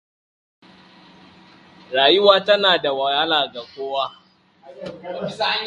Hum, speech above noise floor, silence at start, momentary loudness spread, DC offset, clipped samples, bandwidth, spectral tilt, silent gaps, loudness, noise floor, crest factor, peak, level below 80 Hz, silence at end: none; 29 dB; 1.9 s; 18 LU; under 0.1%; under 0.1%; 10 kHz; -4.5 dB/octave; none; -18 LUFS; -48 dBFS; 22 dB; 0 dBFS; -66 dBFS; 0 s